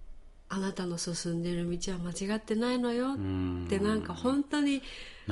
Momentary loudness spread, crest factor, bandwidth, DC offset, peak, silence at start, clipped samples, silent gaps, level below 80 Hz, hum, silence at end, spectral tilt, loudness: 6 LU; 16 dB; 11.5 kHz; under 0.1%; -16 dBFS; 0 s; under 0.1%; none; -50 dBFS; none; 0 s; -5 dB/octave; -32 LUFS